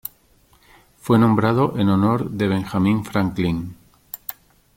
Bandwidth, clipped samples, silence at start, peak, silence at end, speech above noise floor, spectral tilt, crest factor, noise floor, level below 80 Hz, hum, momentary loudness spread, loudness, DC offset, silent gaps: 17 kHz; under 0.1%; 1.05 s; -4 dBFS; 0.45 s; 38 dB; -7.5 dB/octave; 16 dB; -56 dBFS; -50 dBFS; none; 18 LU; -19 LUFS; under 0.1%; none